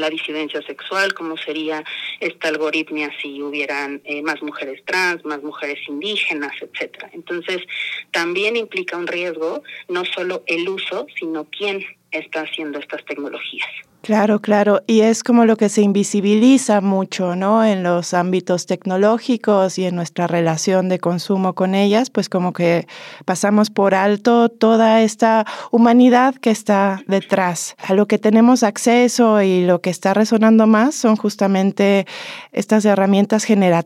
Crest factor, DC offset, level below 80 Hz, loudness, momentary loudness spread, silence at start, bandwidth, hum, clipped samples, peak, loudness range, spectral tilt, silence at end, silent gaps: 14 dB; under 0.1%; -76 dBFS; -17 LUFS; 13 LU; 0 s; 14 kHz; none; under 0.1%; -4 dBFS; 9 LU; -5 dB/octave; 0 s; none